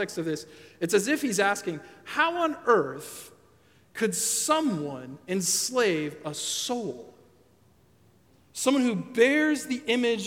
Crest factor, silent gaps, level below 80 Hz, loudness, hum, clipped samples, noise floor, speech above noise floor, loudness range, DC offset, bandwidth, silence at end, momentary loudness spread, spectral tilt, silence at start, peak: 20 dB; none; -74 dBFS; -26 LUFS; none; under 0.1%; -61 dBFS; 34 dB; 3 LU; under 0.1%; 17 kHz; 0 s; 15 LU; -3 dB/octave; 0 s; -8 dBFS